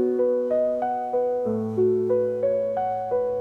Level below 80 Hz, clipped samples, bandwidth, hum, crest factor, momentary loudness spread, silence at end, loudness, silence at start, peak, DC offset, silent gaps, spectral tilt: -64 dBFS; under 0.1%; 4.1 kHz; none; 12 dB; 3 LU; 0 s; -24 LUFS; 0 s; -12 dBFS; under 0.1%; none; -9.5 dB/octave